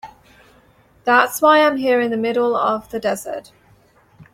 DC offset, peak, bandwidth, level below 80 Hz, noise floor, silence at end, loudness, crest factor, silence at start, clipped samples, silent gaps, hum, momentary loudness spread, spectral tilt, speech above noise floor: under 0.1%; -2 dBFS; 16.5 kHz; -60 dBFS; -53 dBFS; 0.1 s; -17 LUFS; 18 dB; 0.05 s; under 0.1%; none; none; 13 LU; -3.5 dB/octave; 36 dB